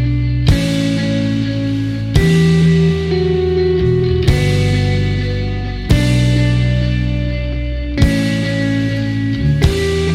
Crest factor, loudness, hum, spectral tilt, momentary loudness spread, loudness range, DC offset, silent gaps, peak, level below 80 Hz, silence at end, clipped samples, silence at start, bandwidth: 14 dB; -15 LUFS; none; -7 dB/octave; 7 LU; 3 LU; under 0.1%; none; 0 dBFS; -22 dBFS; 0 s; under 0.1%; 0 s; 14 kHz